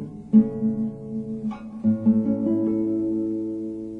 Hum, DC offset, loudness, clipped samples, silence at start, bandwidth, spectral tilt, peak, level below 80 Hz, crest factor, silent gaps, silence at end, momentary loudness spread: none; under 0.1%; -24 LUFS; under 0.1%; 0 s; 2.7 kHz; -11.5 dB/octave; -6 dBFS; -56 dBFS; 18 dB; none; 0 s; 12 LU